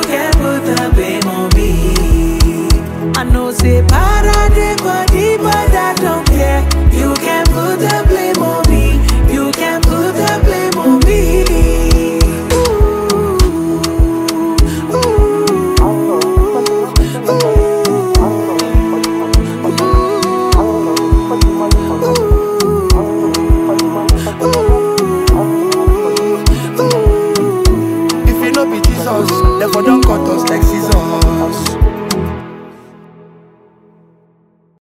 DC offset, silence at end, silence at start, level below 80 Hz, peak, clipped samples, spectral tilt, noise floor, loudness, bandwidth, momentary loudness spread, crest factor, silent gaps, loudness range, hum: under 0.1%; 2.05 s; 0 s; -14 dBFS; 0 dBFS; under 0.1%; -5.5 dB/octave; -52 dBFS; -12 LUFS; 16.5 kHz; 3 LU; 10 dB; none; 1 LU; none